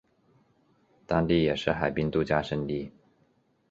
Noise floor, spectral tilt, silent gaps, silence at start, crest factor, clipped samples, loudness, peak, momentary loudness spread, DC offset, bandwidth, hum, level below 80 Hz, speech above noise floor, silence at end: -68 dBFS; -7.5 dB/octave; none; 1.1 s; 22 dB; under 0.1%; -28 LUFS; -8 dBFS; 9 LU; under 0.1%; 7.8 kHz; none; -50 dBFS; 41 dB; 0.8 s